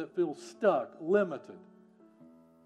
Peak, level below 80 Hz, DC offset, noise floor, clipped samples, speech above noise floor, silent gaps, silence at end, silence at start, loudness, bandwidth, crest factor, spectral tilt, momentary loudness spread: -14 dBFS; under -90 dBFS; under 0.1%; -60 dBFS; under 0.1%; 28 dB; none; 1.1 s; 0 s; -31 LUFS; 10.5 kHz; 18 dB; -6.5 dB/octave; 11 LU